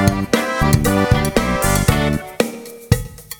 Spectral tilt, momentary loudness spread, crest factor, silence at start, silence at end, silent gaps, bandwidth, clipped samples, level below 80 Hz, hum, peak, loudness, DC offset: -5 dB/octave; 7 LU; 16 dB; 0 s; 0.05 s; none; over 20 kHz; under 0.1%; -28 dBFS; none; 0 dBFS; -17 LUFS; under 0.1%